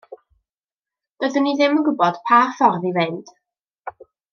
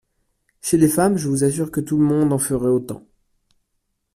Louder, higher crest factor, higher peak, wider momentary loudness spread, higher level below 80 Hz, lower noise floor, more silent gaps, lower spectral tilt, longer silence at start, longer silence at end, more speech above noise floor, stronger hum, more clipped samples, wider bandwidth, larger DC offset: about the same, -18 LUFS vs -19 LUFS; about the same, 20 dB vs 16 dB; about the same, -2 dBFS vs -4 dBFS; first, 22 LU vs 10 LU; second, -74 dBFS vs -50 dBFS; first, under -90 dBFS vs -73 dBFS; first, 0.72-0.83 s, 1.11-1.16 s, 3.64-3.68 s, 3.79-3.83 s vs none; about the same, -6 dB/octave vs -6 dB/octave; second, 0.1 s vs 0.65 s; second, 0.4 s vs 1.15 s; first, over 72 dB vs 55 dB; neither; neither; second, 7 kHz vs 15.5 kHz; neither